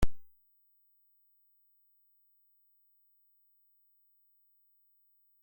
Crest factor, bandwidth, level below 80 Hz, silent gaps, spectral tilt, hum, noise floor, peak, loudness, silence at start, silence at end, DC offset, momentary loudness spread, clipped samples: 24 dB; 16.5 kHz; -48 dBFS; none; -6 dB/octave; 50 Hz at -115 dBFS; -70 dBFS; -14 dBFS; -57 LUFS; 0 s; 5.2 s; under 0.1%; 0 LU; under 0.1%